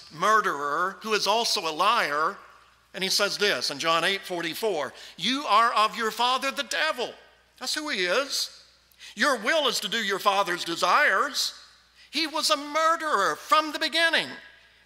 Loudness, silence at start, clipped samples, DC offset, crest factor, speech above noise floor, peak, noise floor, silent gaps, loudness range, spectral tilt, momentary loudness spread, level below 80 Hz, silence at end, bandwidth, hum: -24 LUFS; 0 s; under 0.1%; under 0.1%; 18 dB; 29 dB; -8 dBFS; -55 dBFS; none; 2 LU; -1.5 dB/octave; 9 LU; -72 dBFS; 0.4 s; 16 kHz; none